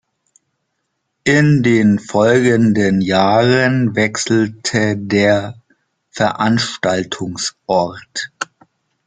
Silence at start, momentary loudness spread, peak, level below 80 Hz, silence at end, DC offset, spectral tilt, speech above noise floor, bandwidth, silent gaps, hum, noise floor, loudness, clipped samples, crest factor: 1.25 s; 12 LU; -2 dBFS; -52 dBFS; 0.65 s; under 0.1%; -5.5 dB/octave; 57 dB; 9.4 kHz; none; none; -71 dBFS; -15 LUFS; under 0.1%; 14 dB